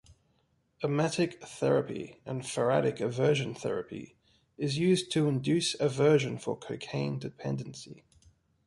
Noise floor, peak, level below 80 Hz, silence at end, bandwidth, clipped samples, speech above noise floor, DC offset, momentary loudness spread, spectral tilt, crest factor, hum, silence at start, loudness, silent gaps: -72 dBFS; -12 dBFS; -66 dBFS; 0.7 s; 11.5 kHz; under 0.1%; 42 dB; under 0.1%; 12 LU; -5.5 dB/octave; 18 dB; none; 0.8 s; -30 LUFS; none